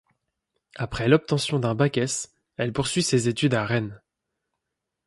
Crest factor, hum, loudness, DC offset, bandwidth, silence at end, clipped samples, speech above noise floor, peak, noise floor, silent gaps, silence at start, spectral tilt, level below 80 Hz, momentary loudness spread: 22 dB; none; -24 LUFS; under 0.1%; 11.5 kHz; 1.1 s; under 0.1%; 60 dB; -4 dBFS; -83 dBFS; none; 0.75 s; -5 dB/octave; -52 dBFS; 11 LU